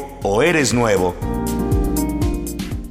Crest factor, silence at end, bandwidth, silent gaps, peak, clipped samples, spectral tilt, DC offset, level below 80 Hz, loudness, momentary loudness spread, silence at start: 14 dB; 0 s; 16 kHz; none; -4 dBFS; under 0.1%; -5 dB/octave; under 0.1%; -26 dBFS; -19 LUFS; 9 LU; 0 s